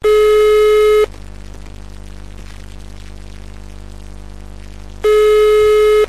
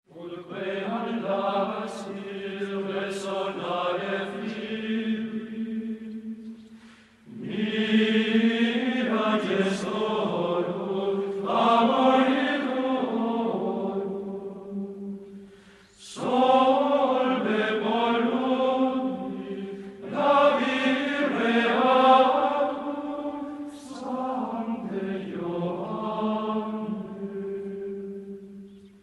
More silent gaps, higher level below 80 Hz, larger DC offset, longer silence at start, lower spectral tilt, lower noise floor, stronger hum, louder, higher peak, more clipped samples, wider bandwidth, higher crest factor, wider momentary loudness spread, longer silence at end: neither; first, -34 dBFS vs -70 dBFS; first, 2% vs under 0.1%; second, 0 s vs 0.15 s; second, -4 dB/octave vs -6 dB/octave; second, -32 dBFS vs -52 dBFS; first, 50 Hz at -35 dBFS vs none; first, -11 LUFS vs -26 LUFS; first, -4 dBFS vs -8 dBFS; neither; first, 14 kHz vs 11.5 kHz; second, 10 dB vs 18 dB; first, 25 LU vs 16 LU; second, 0 s vs 0.15 s